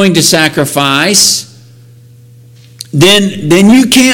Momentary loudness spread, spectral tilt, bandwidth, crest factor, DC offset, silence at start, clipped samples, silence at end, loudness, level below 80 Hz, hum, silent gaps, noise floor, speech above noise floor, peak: 7 LU; -3.5 dB/octave; over 20 kHz; 8 dB; under 0.1%; 0 s; 0.6%; 0 s; -7 LUFS; -42 dBFS; none; none; -37 dBFS; 30 dB; 0 dBFS